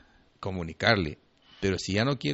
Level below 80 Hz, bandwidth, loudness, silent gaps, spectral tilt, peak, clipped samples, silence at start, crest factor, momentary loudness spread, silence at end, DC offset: -52 dBFS; 8 kHz; -28 LUFS; none; -4 dB/octave; -8 dBFS; under 0.1%; 0.4 s; 22 dB; 13 LU; 0 s; under 0.1%